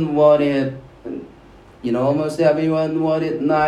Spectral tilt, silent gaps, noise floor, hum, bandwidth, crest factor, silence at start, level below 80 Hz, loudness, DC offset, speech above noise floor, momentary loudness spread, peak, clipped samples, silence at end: -7.5 dB/octave; none; -45 dBFS; none; 11.5 kHz; 16 dB; 0 s; -52 dBFS; -18 LUFS; under 0.1%; 28 dB; 18 LU; -2 dBFS; under 0.1%; 0 s